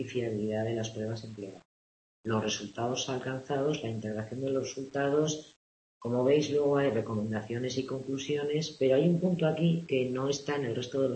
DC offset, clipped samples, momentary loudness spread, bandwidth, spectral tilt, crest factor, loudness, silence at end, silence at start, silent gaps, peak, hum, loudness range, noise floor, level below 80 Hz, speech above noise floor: under 0.1%; under 0.1%; 10 LU; 8.6 kHz; -5.5 dB/octave; 16 dB; -31 LUFS; 0 s; 0 s; 1.65-2.24 s, 5.56-6.01 s; -14 dBFS; none; 5 LU; under -90 dBFS; -68 dBFS; over 60 dB